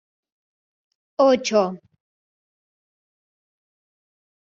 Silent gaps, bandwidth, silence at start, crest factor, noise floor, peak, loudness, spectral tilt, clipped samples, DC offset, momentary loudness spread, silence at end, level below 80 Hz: none; 7.4 kHz; 1.2 s; 20 dB; under -90 dBFS; -6 dBFS; -20 LUFS; -3.5 dB/octave; under 0.1%; under 0.1%; 18 LU; 2.75 s; -72 dBFS